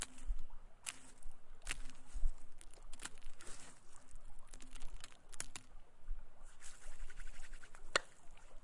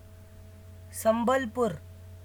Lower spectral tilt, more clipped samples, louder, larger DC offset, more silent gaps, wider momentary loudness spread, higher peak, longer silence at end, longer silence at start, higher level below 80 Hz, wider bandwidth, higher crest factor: second, -2 dB/octave vs -5 dB/octave; neither; second, -49 LUFS vs -28 LUFS; neither; neither; second, 15 LU vs 24 LU; second, -16 dBFS vs -12 dBFS; about the same, 0.05 s vs 0 s; about the same, 0 s vs 0.05 s; first, -48 dBFS vs -56 dBFS; second, 11.5 kHz vs over 20 kHz; first, 26 dB vs 18 dB